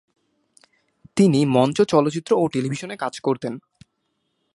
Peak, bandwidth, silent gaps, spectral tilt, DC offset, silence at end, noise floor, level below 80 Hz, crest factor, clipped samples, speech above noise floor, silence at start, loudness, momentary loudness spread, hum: -2 dBFS; 11.5 kHz; none; -6.5 dB/octave; under 0.1%; 0.95 s; -73 dBFS; -62 dBFS; 20 dB; under 0.1%; 53 dB; 1.15 s; -21 LUFS; 11 LU; none